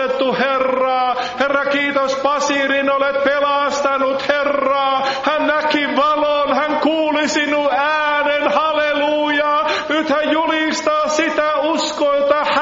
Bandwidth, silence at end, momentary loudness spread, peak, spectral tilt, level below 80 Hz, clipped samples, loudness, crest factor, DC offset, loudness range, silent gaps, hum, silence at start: 7.8 kHz; 0 s; 2 LU; -2 dBFS; -0.5 dB/octave; -54 dBFS; under 0.1%; -16 LUFS; 14 dB; under 0.1%; 1 LU; none; none; 0 s